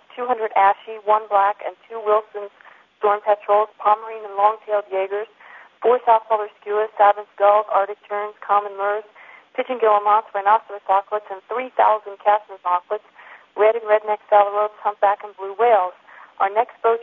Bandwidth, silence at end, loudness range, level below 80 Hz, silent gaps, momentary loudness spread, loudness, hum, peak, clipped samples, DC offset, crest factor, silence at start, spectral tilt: 4 kHz; 0 s; 2 LU; -78 dBFS; none; 11 LU; -20 LUFS; none; -2 dBFS; under 0.1%; under 0.1%; 20 dB; 0.15 s; -5.5 dB/octave